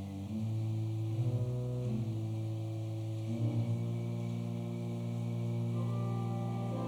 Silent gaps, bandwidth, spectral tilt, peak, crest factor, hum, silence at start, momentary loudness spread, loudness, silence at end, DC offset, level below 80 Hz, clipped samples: none; 9.6 kHz; -8.5 dB/octave; -22 dBFS; 12 dB; none; 0 s; 4 LU; -37 LUFS; 0 s; under 0.1%; -64 dBFS; under 0.1%